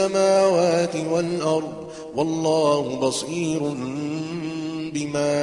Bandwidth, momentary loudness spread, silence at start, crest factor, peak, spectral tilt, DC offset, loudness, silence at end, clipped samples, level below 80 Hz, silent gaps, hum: 11.5 kHz; 11 LU; 0 s; 16 dB; -6 dBFS; -5 dB/octave; under 0.1%; -23 LUFS; 0 s; under 0.1%; -60 dBFS; none; none